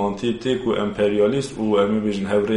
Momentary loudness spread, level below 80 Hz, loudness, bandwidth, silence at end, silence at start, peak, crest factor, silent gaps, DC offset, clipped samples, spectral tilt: 4 LU; -48 dBFS; -21 LUFS; 11.5 kHz; 0 s; 0 s; -6 dBFS; 14 dB; none; under 0.1%; under 0.1%; -6.5 dB/octave